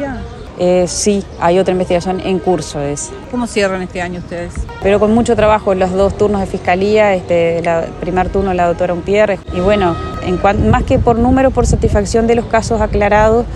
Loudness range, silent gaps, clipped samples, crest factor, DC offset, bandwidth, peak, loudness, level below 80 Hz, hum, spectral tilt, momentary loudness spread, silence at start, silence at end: 4 LU; none; under 0.1%; 14 dB; under 0.1%; 12 kHz; 0 dBFS; -14 LUFS; -26 dBFS; none; -5.5 dB/octave; 9 LU; 0 s; 0 s